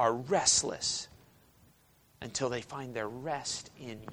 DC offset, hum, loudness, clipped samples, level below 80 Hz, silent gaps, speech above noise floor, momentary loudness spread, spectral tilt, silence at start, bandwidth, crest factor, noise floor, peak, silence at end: under 0.1%; none; -32 LUFS; under 0.1%; -64 dBFS; none; 32 dB; 20 LU; -2 dB/octave; 0 s; over 20 kHz; 22 dB; -65 dBFS; -12 dBFS; 0 s